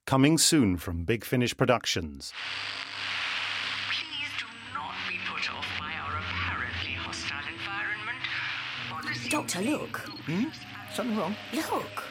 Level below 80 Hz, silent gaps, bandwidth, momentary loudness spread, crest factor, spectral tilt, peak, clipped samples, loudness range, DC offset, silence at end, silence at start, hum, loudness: -54 dBFS; none; 17 kHz; 9 LU; 22 dB; -3.5 dB/octave; -8 dBFS; under 0.1%; 4 LU; under 0.1%; 0 s; 0.05 s; none; -30 LUFS